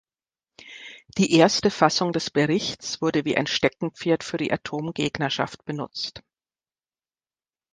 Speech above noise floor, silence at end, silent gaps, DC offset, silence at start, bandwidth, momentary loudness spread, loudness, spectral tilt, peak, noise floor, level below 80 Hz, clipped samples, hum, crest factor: over 67 dB; 1.55 s; none; under 0.1%; 0.65 s; 10 kHz; 14 LU; -24 LUFS; -4.5 dB/octave; -2 dBFS; under -90 dBFS; -60 dBFS; under 0.1%; none; 24 dB